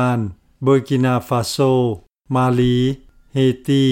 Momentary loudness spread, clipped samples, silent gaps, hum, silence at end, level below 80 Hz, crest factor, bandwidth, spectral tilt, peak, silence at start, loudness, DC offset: 9 LU; under 0.1%; none; none; 0 s; -44 dBFS; 12 dB; 16.5 kHz; -7 dB/octave; -4 dBFS; 0 s; -18 LUFS; under 0.1%